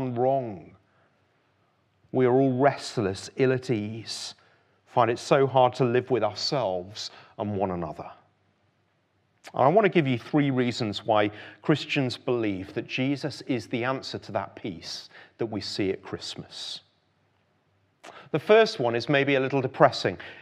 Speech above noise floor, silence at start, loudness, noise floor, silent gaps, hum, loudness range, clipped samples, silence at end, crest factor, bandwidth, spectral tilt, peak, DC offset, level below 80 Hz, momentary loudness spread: 44 dB; 0 s; -26 LUFS; -69 dBFS; none; none; 8 LU; under 0.1%; 0 s; 24 dB; 12 kHz; -6 dB/octave; -2 dBFS; under 0.1%; -70 dBFS; 15 LU